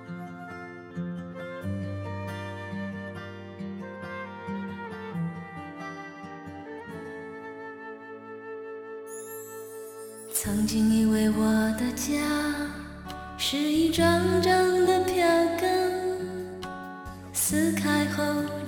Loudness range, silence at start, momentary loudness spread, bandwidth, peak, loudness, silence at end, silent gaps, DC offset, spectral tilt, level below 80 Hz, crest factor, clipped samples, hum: 16 LU; 0 s; 18 LU; 17.5 kHz; -10 dBFS; -27 LUFS; 0 s; none; under 0.1%; -4.5 dB/octave; -52 dBFS; 18 dB; under 0.1%; none